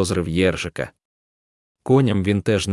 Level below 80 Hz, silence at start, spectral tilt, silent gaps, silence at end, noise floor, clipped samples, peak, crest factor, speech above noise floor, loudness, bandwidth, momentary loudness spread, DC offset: -48 dBFS; 0 s; -6 dB/octave; 1.05-1.75 s; 0 s; under -90 dBFS; under 0.1%; -4 dBFS; 16 dB; over 71 dB; -20 LUFS; 12 kHz; 14 LU; under 0.1%